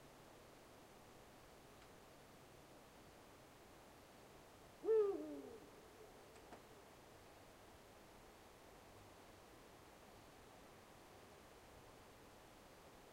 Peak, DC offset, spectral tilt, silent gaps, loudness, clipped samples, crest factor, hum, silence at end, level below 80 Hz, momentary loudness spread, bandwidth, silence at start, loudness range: -30 dBFS; under 0.1%; -5 dB/octave; none; -51 LUFS; under 0.1%; 22 dB; none; 0 s; -74 dBFS; 12 LU; 16 kHz; 0 s; 16 LU